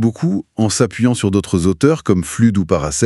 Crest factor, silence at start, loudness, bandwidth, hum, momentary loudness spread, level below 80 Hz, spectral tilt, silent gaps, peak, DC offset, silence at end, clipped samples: 16 dB; 0 s; -16 LUFS; 12 kHz; none; 4 LU; -40 dBFS; -6 dB/octave; none; 0 dBFS; under 0.1%; 0 s; under 0.1%